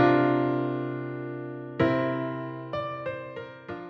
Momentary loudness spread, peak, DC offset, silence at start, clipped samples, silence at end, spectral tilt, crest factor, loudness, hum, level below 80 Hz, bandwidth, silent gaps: 13 LU; -10 dBFS; under 0.1%; 0 s; under 0.1%; 0 s; -9 dB/octave; 18 dB; -29 LUFS; none; -62 dBFS; 6.2 kHz; none